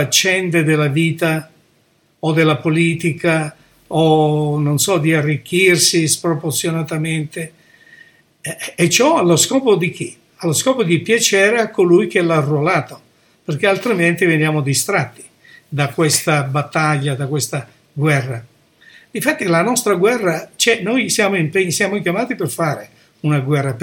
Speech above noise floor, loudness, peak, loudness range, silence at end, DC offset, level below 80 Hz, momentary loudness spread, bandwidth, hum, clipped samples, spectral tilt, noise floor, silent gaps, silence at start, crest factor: 42 dB; -16 LUFS; 0 dBFS; 4 LU; 0 s; under 0.1%; -60 dBFS; 12 LU; 18 kHz; none; under 0.1%; -4 dB/octave; -58 dBFS; none; 0 s; 16 dB